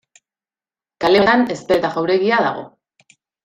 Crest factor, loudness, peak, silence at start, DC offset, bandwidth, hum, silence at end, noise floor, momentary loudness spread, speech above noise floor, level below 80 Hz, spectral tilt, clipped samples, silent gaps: 18 dB; -16 LUFS; -2 dBFS; 1 s; under 0.1%; 13 kHz; none; 0.8 s; under -90 dBFS; 9 LU; over 74 dB; -54 dBFS; -5.5 dB/octave; under 0.1%; none